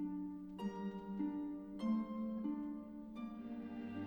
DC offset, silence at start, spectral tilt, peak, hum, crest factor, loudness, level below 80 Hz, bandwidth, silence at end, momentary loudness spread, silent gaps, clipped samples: under 0.1%; 0 s; -8.5 dB/octave; -28 dBFS; none; 14 dB; -44 LUFS; -70 dBFS; 19 kHz; 0 s; 8 LU; none; under 0.1%